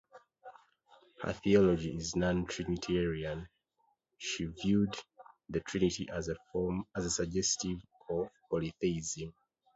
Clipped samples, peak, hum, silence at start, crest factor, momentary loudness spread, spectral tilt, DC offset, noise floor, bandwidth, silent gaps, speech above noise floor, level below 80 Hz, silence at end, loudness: under 0.1%; -14 dBFS; none; 0.15 s; 20 dB; 11 LU; -5 dB/octave; under 0.1%; -77 dBFS; 8.2 kHz; none; 44 dB; -54 dBFS; 0.45 s; -34 LUFS